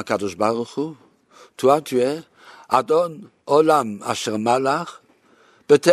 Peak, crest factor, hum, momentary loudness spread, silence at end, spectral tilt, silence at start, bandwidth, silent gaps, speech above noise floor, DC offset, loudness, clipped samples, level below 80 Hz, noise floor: -2 dBFS; 20 dB; none; 12 LU; 0 s; -5 dB/octave; 0 s; 13.5 kHz; none; 35 dB; under 0.1%; -20 LUFS; under 0.1%; -66 dBFS; -56 dBFS